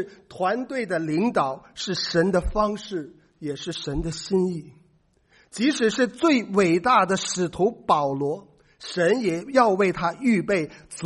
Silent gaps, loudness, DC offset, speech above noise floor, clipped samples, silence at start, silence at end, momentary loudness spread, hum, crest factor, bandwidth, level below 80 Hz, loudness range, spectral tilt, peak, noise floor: none; -23 LUFS; under 0.1%; 39 dB; under 0.1%; 0 s; 0 s; 13 LU; none; 20 dB; 11.5 kHz; -44 dBFS; 5 LU; -5 dB/octave; -4 dBFS; -62 dBFS